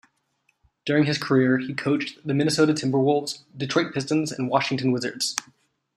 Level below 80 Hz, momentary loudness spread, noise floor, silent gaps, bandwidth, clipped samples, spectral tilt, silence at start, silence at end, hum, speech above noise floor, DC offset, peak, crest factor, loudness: -66 dBFS; 6 LU; -70 dBFS; none; 13.5 kHz; under 0.1%; -5 dB/octave; 0.85 s; 0.55 s; none; 47 dB; under 0.1%; -2 dBFS; 22 dB; -23 LUFS